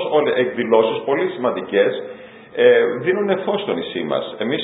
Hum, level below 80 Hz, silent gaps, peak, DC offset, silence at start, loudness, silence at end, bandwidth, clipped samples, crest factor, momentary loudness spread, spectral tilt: none; -64 dBFS; none; 0 dBFS; under 0.1%; 0 s; -18 LUFS; 0 s; 4 kHz; under 0.1%; 18 dB; 9 LU; -10.5 dB/octave